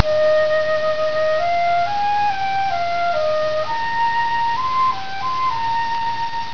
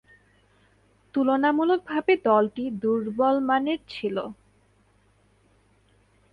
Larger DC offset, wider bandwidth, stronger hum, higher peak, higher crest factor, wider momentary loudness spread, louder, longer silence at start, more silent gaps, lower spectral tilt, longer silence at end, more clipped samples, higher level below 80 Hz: first, 5% vs under 0.1%; about the same, 5.4 kHz vs 5.4 kHz; neither; first, 0 dBFS vs -8 dBFS; about the same, 18 dB vs 18 dB; second, 5 LU vs 9 LU; first, -19 LUFS vs -24 LUFS; second, 0 s vs 1.15 s; neither; second, -4 dB/octave vs -7.5 dB/octave; second, 0 s vs 2 s; neither; first, -52 dBFS vs -64 dBFS